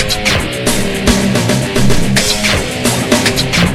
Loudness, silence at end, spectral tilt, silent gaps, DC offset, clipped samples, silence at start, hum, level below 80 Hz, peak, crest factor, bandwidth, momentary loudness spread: -12 LUFS; 0 s; -3.5 dB/octave; none; under 0.1%; under 0.1%; 0 s; none; -24 dBFS; 0 dBFS; 12 dB; 16.5 kHz; 3 LU